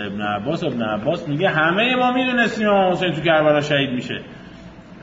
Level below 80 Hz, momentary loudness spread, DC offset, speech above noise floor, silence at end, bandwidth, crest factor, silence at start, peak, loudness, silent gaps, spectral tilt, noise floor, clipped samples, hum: -52 dBFS; 9 LU; under 0.1%; 21 dB; 0 s; 7.8 kHz; 16 dB; 0 s; -4 dBFS; -19 LUFS; none; -6 dB/octave; -40 dBFS; under 0.1%; none